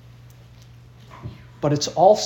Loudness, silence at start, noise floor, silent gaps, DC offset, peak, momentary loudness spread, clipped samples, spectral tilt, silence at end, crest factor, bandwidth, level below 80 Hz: -20 LUFS; 1.15 s; -46 dBFS; none; under 0.1%; -2 dBFS; 23 LU; under 0.1%; -5 dB/octave; 0 s; 20 dB; 17 kHz; -54 dBFS